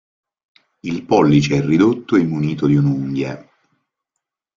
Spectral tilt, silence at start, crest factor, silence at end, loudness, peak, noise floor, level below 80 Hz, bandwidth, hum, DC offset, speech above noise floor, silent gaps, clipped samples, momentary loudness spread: -7.5 dB/octave; 0.85 s; 16 dB; 1.15 s; -17 LUFS; -2 dBFS; -80 dBFS; -50 dBFS; 7.4 kHz; none; under 0.1%; 64 dB; none; under 0.1%; 13 LU